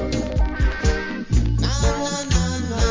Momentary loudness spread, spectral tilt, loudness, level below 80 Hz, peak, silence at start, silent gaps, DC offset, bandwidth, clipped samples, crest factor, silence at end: 3 LU; -5 dB/octave; -22 LUFS; -22 dBFS; -4 dBFS; 0 s; none; under 0.1%; 7.6 kHz; under 0.1%; 16 dB; 0 s